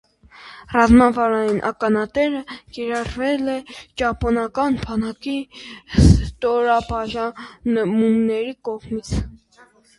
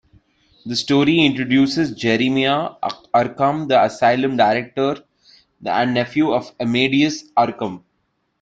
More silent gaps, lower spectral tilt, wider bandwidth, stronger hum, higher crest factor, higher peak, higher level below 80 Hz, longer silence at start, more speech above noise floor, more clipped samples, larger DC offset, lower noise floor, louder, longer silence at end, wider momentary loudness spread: neither; first, -7 dB/octave vs -5.5 dB/octave; first, 11.5 kHz vs 8.8 kHz; neither; about the same, 20 dB vs 16 dB; about the same, 0 dBFS vs -2 dBFS; first, -30 dBFS vs -58 dBFS; second, 0.4 s vs 0.65 s; second, 33 dB vs 51 dB; neither; neither; second, -53 dBFS vs -69 dBFS; about the same, -20 LUFS vs -18 LUFS; about the same, 0.6 s vs 0.65 s; first, 15 LU vs 9 LU